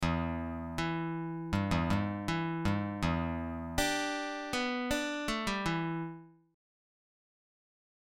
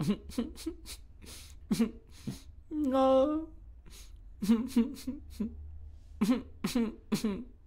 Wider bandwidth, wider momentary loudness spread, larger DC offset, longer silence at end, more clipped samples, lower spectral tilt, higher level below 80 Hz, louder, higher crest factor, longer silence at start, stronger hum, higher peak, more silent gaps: about the same, 16.5 kHz vs 16 kHz; second, 7 LU vs 22 LU; neither; first, 1.7 s vs 0 s; neither; about the same, -5 dB/octave vs -6 dB/octave; about the same, -48 dBFS vs -52 dBFS; about the same, -34 LUFS vs -32 LUFS; about the same, 20 dB vs 18 dB; about the same, 0 s vs 0 s; neither; about the same, -16 dBFS vs -16 dBFS; neither